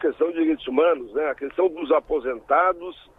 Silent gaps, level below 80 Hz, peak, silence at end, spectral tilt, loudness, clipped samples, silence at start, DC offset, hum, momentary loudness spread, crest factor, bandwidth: none; -54 dBFS; -8 dBFS; 0.25 s; -7 dB/octave; -23 LUFS; under 0.1%; 0 s; under 0.1%; none; 6 LU; 16 dB; 4 kHz